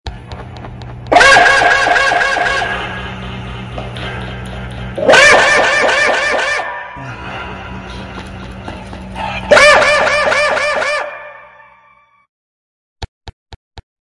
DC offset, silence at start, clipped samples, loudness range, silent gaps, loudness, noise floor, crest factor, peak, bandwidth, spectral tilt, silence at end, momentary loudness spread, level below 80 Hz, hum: under 0.1%; 0.05 s; 0.1%; 9 LU; 12.29-12.96 s, 13.08-13.21 s, 13.33-13.46 s, 13.56-13.71 s; -10 LUFS; -49 dBFS; 14 dB; 0 dBFS; 12 kHz; -2.5 dB/octave; 0.2 s; 23 LU; -36 dBFS; none